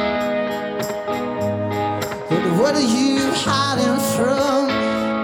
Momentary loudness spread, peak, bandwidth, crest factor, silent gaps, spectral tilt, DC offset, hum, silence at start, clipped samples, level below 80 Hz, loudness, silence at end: 7 LU; -4 dBFS; 19 kHz; 14 dB; none; -4.5 dB/octave; under 0.1%; none; 0 s; under 0.1%; -52 dBFS; -19 LUFS; 0 s